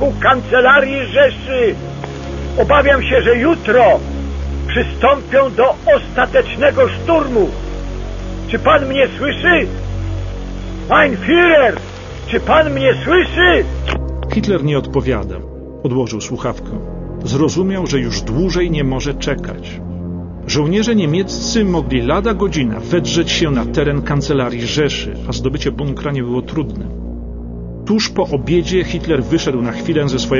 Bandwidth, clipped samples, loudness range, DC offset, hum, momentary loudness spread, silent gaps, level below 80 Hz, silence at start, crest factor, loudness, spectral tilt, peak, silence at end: 7.4 kHz; under 0.1%; 6 LU; under 0.1%; none; 15 LU; none; -28 dBFS; 0 s; 14 dB; -15 LUFS; -5.5 dB/octave; -2 dBFS; 0 s